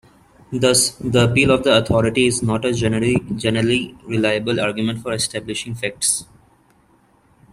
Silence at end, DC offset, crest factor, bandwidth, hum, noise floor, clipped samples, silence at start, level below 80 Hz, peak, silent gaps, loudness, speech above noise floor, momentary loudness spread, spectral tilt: 1.3 s; under 0.1%; 18 dB; 15 kHz; none; -56 dBFS; under 0.1%; 0.5 s; -46 dBFS; -2 dBFS; none; -18 LUFS; 38 dB; 9 LU; -4 dB/octave